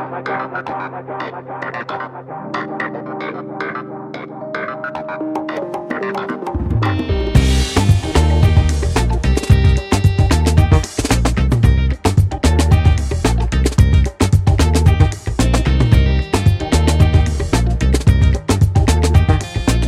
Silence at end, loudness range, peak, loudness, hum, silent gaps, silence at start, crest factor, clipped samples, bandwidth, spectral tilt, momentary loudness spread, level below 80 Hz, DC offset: 0 s; 11 LU; 0 dBFS; -16 LUFS; none; none; 0 s; 14 dB; under 0.1%; 13.5 kHz; -6 dB/octave; 12 LU; -18 dBFS; under 0.1%